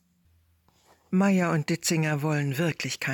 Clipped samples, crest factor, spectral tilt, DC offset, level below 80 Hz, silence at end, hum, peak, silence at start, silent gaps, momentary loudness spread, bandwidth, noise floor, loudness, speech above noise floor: under 0.1%; 12 dB; -5 dB/octave; under 0.1%; -70 dBFS; 0 s; none; -14 dBFS; 1.1 s; none; 5 LU; 18 kHz; -65 dBFS; -26 LUFS; 40 dB